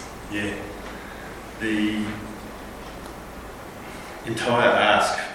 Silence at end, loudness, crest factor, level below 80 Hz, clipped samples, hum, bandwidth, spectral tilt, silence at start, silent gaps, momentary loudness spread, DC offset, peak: 0 s; -23 LUFS; 22 dB; -46 dBFS; under 0.1%; none; 17 kHz; -4 dB/octave; 0 s; none; 20 LU; under 0.1%; -4 dBFS